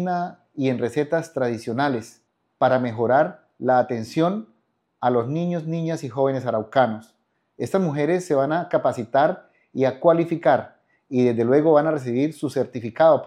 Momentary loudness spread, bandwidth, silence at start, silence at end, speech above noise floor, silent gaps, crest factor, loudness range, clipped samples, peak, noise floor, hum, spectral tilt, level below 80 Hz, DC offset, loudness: 8 LU; 13 kHz; 0 s; 0 s; 47 dB; none; 18 dB; 4 LU; under 0.1%; -4 dBFS; -68 dBFS; none; -7 dB/octave; -74 dBFS; under 0.1%; -22 LUFS